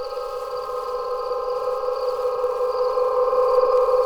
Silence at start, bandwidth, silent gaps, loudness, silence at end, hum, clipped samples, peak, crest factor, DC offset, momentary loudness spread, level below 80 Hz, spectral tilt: 0 s; 13.5 kHz; none; -23 LUFS; 0 s; none; under 0.1%; -6 dBFS; 16 dB; under 0.1%; 10 LU; -50 dBFS; -3 dB/octave